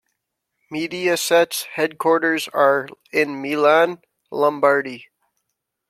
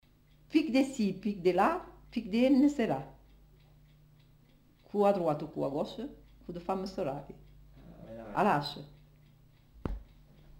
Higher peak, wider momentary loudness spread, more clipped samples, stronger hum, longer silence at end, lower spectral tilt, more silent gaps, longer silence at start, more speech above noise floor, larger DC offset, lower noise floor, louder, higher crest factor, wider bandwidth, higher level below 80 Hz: first, -2 dBFS vs -14 dBFS; second, 14 LU vs 20 LU; neither; second, none vs 50 Hz at -60 dBFS; first, 0.85 s vs 0.55 s; second, -3.5 dB/octave vs -6.5 dB/octave; neither; first, 0.7 s vs 0.5 s; first, 59 dB vs 32 dB; neither; first, -78 dBFS vs -62 dBFS; first, -19 LUFS vs -31 LUFS; about the same, 18 dB vs 20 dB; about the same, 16 kHz vs 16 kHz; second, -72 dBFS vs -54 dBFS